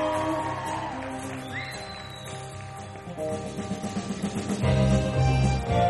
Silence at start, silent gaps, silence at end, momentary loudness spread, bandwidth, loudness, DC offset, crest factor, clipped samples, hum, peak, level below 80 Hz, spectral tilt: 0 s; none; 0 s; 15 LU; 12 kHz; -28 LUFS; under 0.1%; 16 dB; under 0.1%; none; -12 dBFS; -38 dBFS; -6 dB/octave